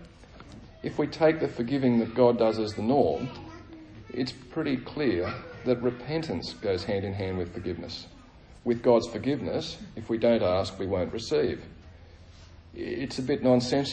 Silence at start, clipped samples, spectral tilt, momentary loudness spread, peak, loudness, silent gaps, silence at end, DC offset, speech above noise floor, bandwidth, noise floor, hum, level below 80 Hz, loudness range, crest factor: 0 s; under 0.1%; -6.5 dB/octave; 16 LU; -8 dBFS; -28 LUFS; none; 0 s; under 0.1%; 24 dB; 9.4 kHz; -51 dBFS; none; -54 dBFS; 5 LU; 20 dB